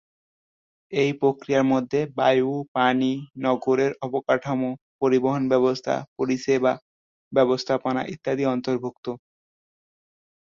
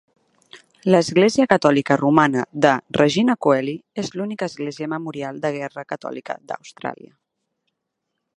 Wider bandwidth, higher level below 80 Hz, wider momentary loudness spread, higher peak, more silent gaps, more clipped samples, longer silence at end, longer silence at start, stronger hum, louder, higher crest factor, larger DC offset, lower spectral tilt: second, 7.4 kHz vs 11 kHz; about the same, -66 dBFS vs -62 dBFS; second, 7 LU vs 15 LU; second, -6 dBFS vs 0 dBFS; first, 2.68-2.75 s, 4.81-4.99 s, 6.08-6.16 s, 6.82-7.31 s, 8.97-9.03 s vs none; neither; second, 1.25 s vs 1.4 s; first, 0.9 s vs 0.55 s; neither; second, -23 LUFS vs -20 LUFS; about the same, 18 dB vs 20 dB; neither; about the same, -6.5 dB/octave vs -5.5 dB/octave